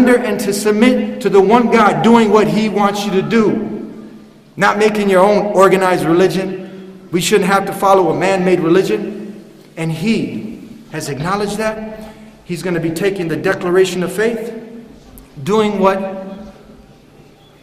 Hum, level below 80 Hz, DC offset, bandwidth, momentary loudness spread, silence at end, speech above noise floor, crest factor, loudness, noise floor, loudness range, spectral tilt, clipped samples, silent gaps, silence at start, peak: none; -48 dBFS; under 0.1%; 15.5 kHz; 18 LU; 1.1 s; 30 dB; 14 dB; -14 LUFS; -43 dBFS; 8 LU; -5.5 dB/octave; under 0.1%; none; 0 s; 0 dBFS